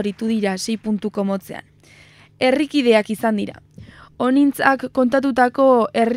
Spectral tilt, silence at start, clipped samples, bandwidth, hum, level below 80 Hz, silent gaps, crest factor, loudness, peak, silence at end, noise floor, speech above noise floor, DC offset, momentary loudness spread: -5.5 dB/octave; 0 s; under 0.1%; 16 kHz; none; -58 dBFS; none; 18 dB; -18 LUFS; 0 dBFS; 0 s; -48 dBFS; 30 dB; under 0.1%; 9 LU